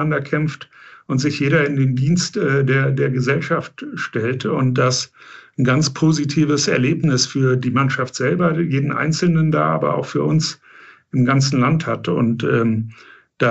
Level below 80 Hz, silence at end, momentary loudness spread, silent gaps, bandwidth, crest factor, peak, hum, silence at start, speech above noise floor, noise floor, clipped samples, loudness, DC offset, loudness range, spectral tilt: -60 dBFS; 0 s; 7 LU; none; 8.2 kHz; 14 dB; -4 dBFS; none; 0 s; 28 dB; -46 dBFS; under 0.1%; -18 LUFS; 0.2%; 2 LU; -5.5 dB/octave